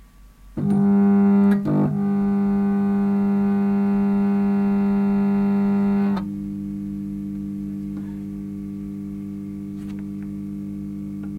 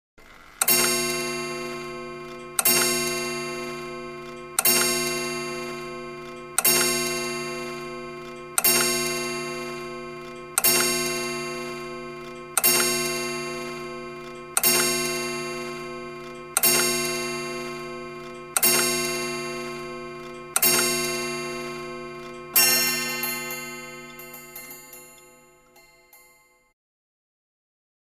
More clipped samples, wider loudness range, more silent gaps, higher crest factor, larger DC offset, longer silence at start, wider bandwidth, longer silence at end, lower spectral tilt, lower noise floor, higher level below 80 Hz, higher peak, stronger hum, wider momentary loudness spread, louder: neither; first, 12 LU vs 3 LU; neither; second, 12 dB vs 24 dB; neither; second, 0 s vs 0.2 s; second, 4.4 kHz vs 15.5 kHz; second, 0 s vs 1.85 s; first, -10 dB/octave vs -1 dB/octave; second, -46 dBFS vs -58 dBFS; first, -48 dBFS vs -58 dBFS; second, -10 dBFS vs -2 dBFS; first, 50 Hz at -20 dBFS vs none; second, 14 LU vs 19 LU; about the same, -22 LUFS vs -23 LUFS